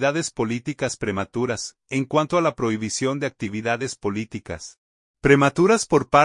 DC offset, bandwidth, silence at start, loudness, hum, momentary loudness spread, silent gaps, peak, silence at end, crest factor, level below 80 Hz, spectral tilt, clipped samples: under 0.1%; 11 kHz; 0 s; -22 LUFS; none; 13 LU; 4.78-5.14 s; -2 dBFS; 0 s; 20 dB; -50 dBFS; -5 dB/octave; under 0.1%